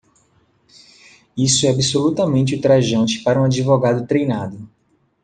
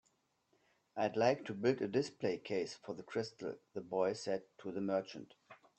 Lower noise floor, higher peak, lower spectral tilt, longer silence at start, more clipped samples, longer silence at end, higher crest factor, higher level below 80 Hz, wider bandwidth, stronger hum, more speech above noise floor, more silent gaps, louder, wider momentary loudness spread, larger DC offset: second, -59 dBFS vs -79 dBFS; first, -2 dBFS vs -18 dBFS; about the same, -5 dB/octave vs -5.5 dB/octave; first, 1.35 s vs 0.95 s; neither; first, 0.6 s vs 0.25 s; about the same, 16 dB vs 20 dB; first, -52 dBFS vs -82 dBFS; first, 9.8 kHz vs 8.8 kHz; neither; about the same, 42 dB vs 41 dB; neither; first, -17 LUFS vs -39 LUFS; second, 9 LU vs 14 LU; neither